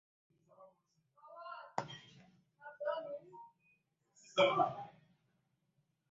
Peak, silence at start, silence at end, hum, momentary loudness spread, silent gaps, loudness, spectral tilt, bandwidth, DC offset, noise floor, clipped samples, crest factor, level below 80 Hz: -16 dBFS; 0.6 s; 1.2 s; none; 26 LU; none; -38 LUFS; -2 dB/octave; 7.4 kHz; under 0.1%; -81 dBFS; under 0.1%; 26 dB; -86 dBFS